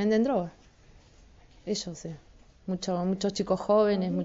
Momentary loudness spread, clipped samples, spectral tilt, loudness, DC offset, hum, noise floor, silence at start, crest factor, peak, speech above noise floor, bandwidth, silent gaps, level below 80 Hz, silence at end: 19 LU; under 0.1%; -6 dB/octave; -28 LUFS; under 0.1%; none; -56 dBFS; 0 s; 16 dB; -12 dBFS; 29 dB; 8 kHz; none; -58 dBFS; 0 s